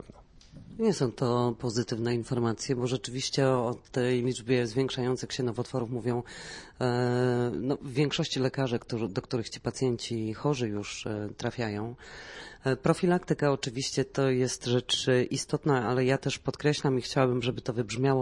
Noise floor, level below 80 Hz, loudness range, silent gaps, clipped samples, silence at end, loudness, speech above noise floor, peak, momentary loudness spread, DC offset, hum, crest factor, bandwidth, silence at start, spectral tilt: -53 dBFS; -58 dBFS; 4 LU; none; under 0.1%; 0 s; -29 LUFS; 24 dB; -10 dBFS; 8 LU; under 0.1%; none; 20 dB; 11.5 kHz; 0.1 s; -5.5 dB/octave